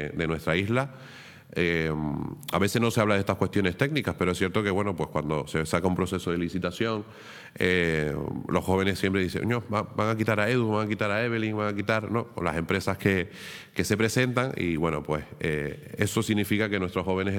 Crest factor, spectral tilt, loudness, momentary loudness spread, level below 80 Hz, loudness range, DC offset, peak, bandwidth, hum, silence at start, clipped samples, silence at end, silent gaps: 20 dB; -5.5 dB/octave; -27 LUFS; 7 LU; -54 dBFS; 2 LU; under 0.1%; -6 dBFS; 19 kHz; none; 0 s; under 0.1%; 0 s; none